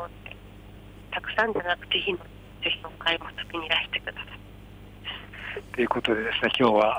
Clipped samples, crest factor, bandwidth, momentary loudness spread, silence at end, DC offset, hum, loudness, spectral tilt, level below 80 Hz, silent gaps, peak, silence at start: under 0.1%; 20 dB; over 20 kHz; 22 LU; 0 s; under 0.1%; 50 Hz at -50 dBFS; -27 LUFS; -5 dB/octave; -50 dBFS; none; -10 dBFS; 0 s